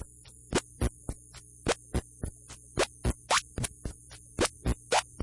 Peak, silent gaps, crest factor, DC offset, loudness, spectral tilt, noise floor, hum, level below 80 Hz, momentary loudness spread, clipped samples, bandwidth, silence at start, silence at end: -14 dBFS; none; 20 dB; under 0.1%; -32 LUFS; -3.5 dB/octave; -52 dBFS; none; -42 dBFS; 19 LU; under 0.1%; 11.5 kHz; 0 s; 0 s